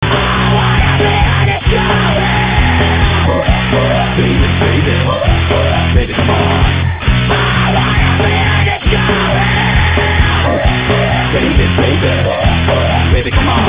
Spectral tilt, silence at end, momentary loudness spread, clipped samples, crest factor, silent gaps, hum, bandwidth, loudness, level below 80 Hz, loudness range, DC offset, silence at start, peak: -10 dB/octave; 0 s; 2 LU; under 0.1%; 10 dB; none; none; 4 kHz; -11 LUFS; -16 dBFS; 1 LU; 0.8%; 0 s; 0 dBFS